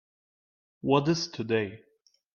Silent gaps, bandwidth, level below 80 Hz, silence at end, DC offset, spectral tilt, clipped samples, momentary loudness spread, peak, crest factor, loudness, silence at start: none; 7.2 kHz; -66 dBFS; 0.55 s; under 0.1%; -5.5 dB/octave; under 0.1%; 11 LU; -10 dBFS; 22 dB; -28 LUFS; 0.85 s